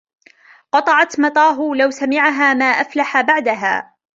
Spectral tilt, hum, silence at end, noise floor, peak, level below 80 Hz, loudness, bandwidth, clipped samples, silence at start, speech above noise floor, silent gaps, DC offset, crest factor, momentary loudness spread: -3 dB/octave; none; 0.35 s; -48 dBFS; -2 dBFS; -66 dBFS; -15 LUFS; 7.8 kHz; under 0.1%; 0.75 s; 33 dB; none; under 0.1%; 16 dB; 5 LU